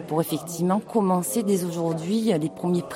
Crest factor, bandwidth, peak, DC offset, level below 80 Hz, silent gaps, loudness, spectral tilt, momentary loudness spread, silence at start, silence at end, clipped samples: 16 dB; 16 kHz; -8 dBFS; under 0.1%; -66 dBFS; none; -24 LUFS; -6 dB/octave; 4 LU; 0 s; 0 s; under 0.1%